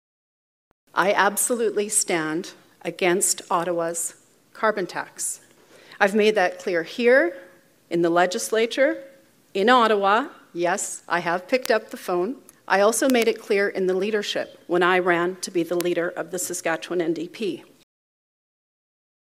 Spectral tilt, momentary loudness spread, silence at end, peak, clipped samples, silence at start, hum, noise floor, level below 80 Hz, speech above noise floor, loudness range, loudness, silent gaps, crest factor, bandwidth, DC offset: -3 dB/octave; 11 LU; 1.75 s; 0 dBFS; under 0.1%; 0.95 s; none; -50 dBFS; -80 dBFS; 28 dB; 3 LU; -22 LUFS; none; 24 dB; 16 kHz; under 0.1%